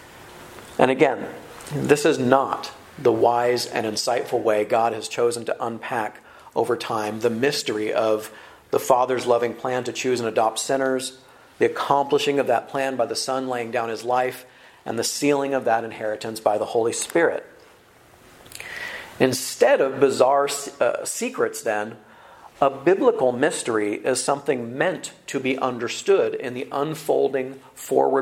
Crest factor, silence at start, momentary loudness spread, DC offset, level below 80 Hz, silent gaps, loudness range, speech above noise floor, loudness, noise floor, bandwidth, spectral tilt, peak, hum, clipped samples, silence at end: 22 dB; 0 s; 13 LU; under 0.1%; -64 dBFS; none; 3 LU; 30 dB; -22 LUFS; -52 dBFS; 16 kHz; -4 dB/octave; 0 dBFS; none; under 0.1%; 0 s